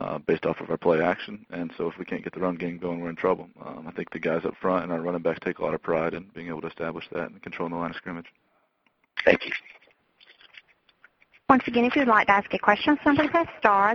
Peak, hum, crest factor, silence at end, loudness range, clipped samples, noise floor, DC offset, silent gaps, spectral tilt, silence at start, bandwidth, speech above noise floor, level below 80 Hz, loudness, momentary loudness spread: -2 dBFS; none; 24 dB; 0 s; 8 LU; under 0.1%; -70 dBFS; under 0.1%; none; -7 dB/octave; 0 s; 6.8 kHz; 44 dB; -60 dBFS; -26 LUFS; 15 LU